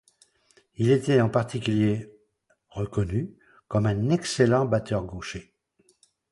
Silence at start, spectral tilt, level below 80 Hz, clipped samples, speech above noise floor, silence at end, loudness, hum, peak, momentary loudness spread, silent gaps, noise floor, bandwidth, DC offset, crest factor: 0.8 s; -6.5 dB/octave; -50 dBFS; under 0.1%; 45 dB; 0.9 s; -25 LUFS; none; -6 dBFS; 15 LU; none; -69 dBFS; 11.5 kHz; under 0.1%; 20 dB